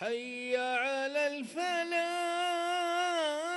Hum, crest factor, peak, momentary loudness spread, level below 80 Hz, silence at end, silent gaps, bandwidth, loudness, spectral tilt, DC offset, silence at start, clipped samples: none; 14 dB; -18 dBFS; 4 LU; -82 dBFS; 0 s; none; 12 kHz; -32 LUFS; -1.5 dB/octave; under 0.1%; 0 s; under 0.1%